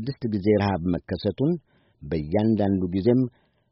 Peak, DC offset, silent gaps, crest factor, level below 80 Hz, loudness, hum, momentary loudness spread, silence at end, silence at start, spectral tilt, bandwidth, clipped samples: -8 dBFS; under 0.1%; none; 16 dB; -50 dBFS; -24 LUFS; none; 9 LU; 0.4 s; 0 s; -7.5 dB/octave; 5.8 kHz; under 0.1%